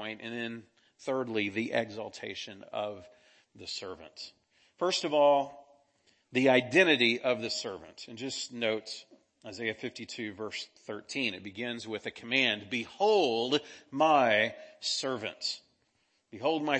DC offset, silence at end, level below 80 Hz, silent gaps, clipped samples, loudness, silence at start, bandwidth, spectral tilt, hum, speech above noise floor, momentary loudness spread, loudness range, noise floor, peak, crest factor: under 0.1%; 0 s; -78 dBFS; none; under 0.1%; -30 LUFS; 0 s; 8.8 kHz; -3.5 dB/octave; none; 43 dB; 18 LU; 10 LU; -74 dBFS; -8 dBFS; 24 dB